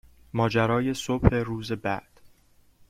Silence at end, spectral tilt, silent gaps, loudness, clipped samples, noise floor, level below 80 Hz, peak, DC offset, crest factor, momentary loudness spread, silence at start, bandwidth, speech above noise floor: 0.6 s; -6.5 dB/octave; none; -26 LUFS; under 0.1%; -60 dBFS; -40 dBFS; -4 dBFS; under 0.1%; 24 dB; 9 LU; 0.35 s; 15.5 kHz; 35 dB